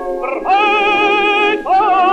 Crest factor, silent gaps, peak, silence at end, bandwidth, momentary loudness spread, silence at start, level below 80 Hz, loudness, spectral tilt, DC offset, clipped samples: 10 dB; none; -2 dBFS; 0 s; 9 kHz; 5 LU; 0 s; -44 dBFS; -13 LUFS; -3.5 dB/octave; under 0.1%; under 0.1%